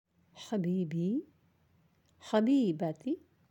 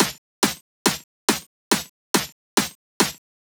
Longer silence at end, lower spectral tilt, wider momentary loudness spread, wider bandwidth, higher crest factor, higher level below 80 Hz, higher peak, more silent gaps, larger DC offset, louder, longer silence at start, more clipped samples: about the same, 0.35 s vs 0.25 s; first, -7.5 dB/octave vs -2 dB/octave; first, 12 LU vs 1 LU; second, 16.5 kHz vs over 20 kHz; second, 18 dB vs 24 dB; second, -82 dBFS vs -58 dBFS; second, -16 dBFS vs -2 dBFS; second, none vs 0.18-0.42 s, 0.61-0.85 s, 1.04-1.28 s, 1.46-1.71 s, 1.89-2.14 s, 2.32-2.57 s, 2.75-3.00 s; neither; second, -33 LUFS vs -24 LUFS; first, 0.35 s vs 0 s; neither